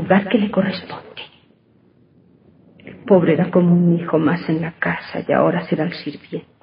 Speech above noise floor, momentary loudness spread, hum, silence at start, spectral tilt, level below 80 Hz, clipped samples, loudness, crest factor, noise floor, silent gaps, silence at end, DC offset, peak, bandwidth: 37 dB; 18 LU; none; 0 s; -12 dB/octave; -62 dBFS; under 0.1%; -18 LUFS; 18 dB; -55 dBFS; none; 0.2 s; under 0.1%; -2 dBFS; 5.4 kHz